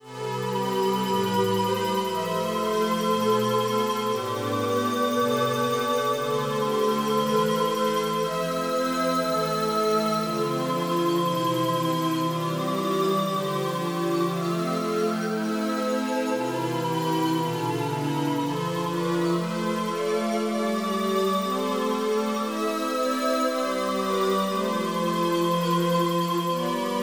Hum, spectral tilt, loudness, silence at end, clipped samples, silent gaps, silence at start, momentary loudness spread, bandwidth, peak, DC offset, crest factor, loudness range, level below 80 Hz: none; -5 dB/octave; -25 LUFS; 0 s; under 0.1%; none; 0.05 s; 4 LU; over 20 kHz; -12 dBFS; under 0.1%; 14 dB; 2 LU; -78 dBFS